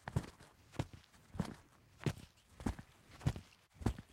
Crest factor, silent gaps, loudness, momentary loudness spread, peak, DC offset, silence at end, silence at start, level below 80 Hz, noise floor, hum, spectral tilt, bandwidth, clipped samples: 24 dB; none; -45 LUFS; 19 LU; -22 dBFS; under 0.1%; 0.1 s; 0.05 s; -54 dBFS; -63 dBFS; none; -6.5 dB/octave; 16 kHz; under 0.1%